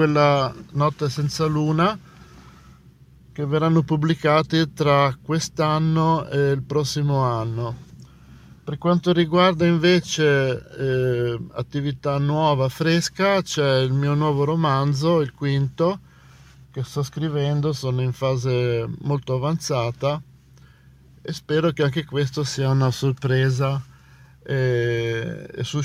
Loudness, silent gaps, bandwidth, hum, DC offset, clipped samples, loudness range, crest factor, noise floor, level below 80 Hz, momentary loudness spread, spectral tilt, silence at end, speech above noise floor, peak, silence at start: -21 LUFS; none; 14.5 kHz; none; under 0.1%; under 0.1%; 5 LU; 16 dB; -50 dBFS; -52 dBFS; 9 LU; -6 dB/octave; 0 s; 29 dB; -6 dBFS; 0 s